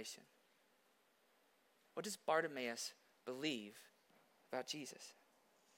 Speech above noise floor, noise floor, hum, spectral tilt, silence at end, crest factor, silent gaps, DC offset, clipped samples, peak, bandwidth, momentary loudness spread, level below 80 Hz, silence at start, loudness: 31 dB; -77 dBFS; none; -2.5 dB/octave; 0.65 s; 24 dB; none; under 0.1%; under 0.1%; -24 dBFS; 16.5 kHz; 18 LU; under -90 dBFS; 0 s; -45 LUFS